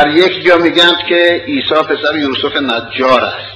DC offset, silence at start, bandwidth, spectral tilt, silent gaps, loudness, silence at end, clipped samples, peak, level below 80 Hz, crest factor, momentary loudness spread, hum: under 0.1%; 0 s; 12 kHz; -4.5 dB/octave; none; -11 LUFS; 0 s; 0.5%; 0 dBFS; -50 dBFS; 12 dB; 6 LU; none